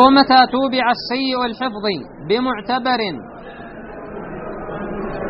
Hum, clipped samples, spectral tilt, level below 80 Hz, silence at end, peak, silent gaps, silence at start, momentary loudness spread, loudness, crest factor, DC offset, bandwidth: none; under 0.1%; -2 dB/octave; -44 dBFS; 0 s; 0 dBFS; none; 0 s; 21 LU; -18 LUFS; 18 dB; under 0.1%; 6 kHz